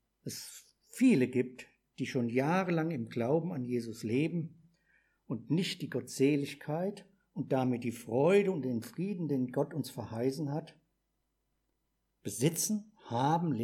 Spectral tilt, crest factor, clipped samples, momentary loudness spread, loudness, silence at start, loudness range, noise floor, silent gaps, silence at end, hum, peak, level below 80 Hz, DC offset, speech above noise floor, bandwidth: -6 dB/octave; 18 dB; under 0.1%; 14 LU; -33 LUFS; 0.25 s; 5 LU; -81 dBFS; none; 0 s; none; -16 dBFS; -78 dBFS; under 0.1%; 49 dB; 17 kHz